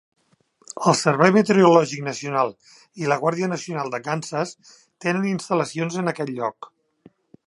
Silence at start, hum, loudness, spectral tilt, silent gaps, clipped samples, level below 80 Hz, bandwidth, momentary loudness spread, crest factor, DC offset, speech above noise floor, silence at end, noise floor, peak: 0.75 s; none; -21 LUFS; -5.5 dB/octave; none; under 0.1%; -70 dBFS; 11.5 kHz; 13 LU; 22 dB; under 0.1%; 41 dB; 0.8 s; -62 dBFS; 0 dBFS